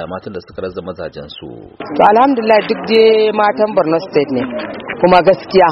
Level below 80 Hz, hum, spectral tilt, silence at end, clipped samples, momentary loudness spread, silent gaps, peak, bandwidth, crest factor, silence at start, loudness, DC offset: -48 dBFS; none; -7.5 dB/octave; 0 s; under 0.1%; 18 LU; none; 0 dBFS; 6 kHz; 14 dB; 0 s; -12 LUFS; under 0.1%